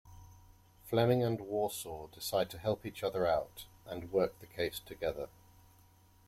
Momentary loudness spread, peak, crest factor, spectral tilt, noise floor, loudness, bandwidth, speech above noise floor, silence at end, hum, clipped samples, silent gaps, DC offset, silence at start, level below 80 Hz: 15 LU; -16 dBFS; 20 dB; -5.5 dB/octave; -64 dBFS; -35 LUFS; 16.5 kHz; 29 dB; 1 s; none; under 0.1%; none; under 0.1%; 0.05 s; -62 dBFS